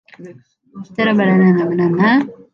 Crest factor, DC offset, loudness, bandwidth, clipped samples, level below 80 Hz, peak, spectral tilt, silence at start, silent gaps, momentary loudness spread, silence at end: 12 dB; under 0.1%; -14 LUFS; 5.8 kHz; under 0.1%; -62 dBFS; -2 dBFS; -9 dB/octave; 0.2 s; none; 6 LU; 0.2 s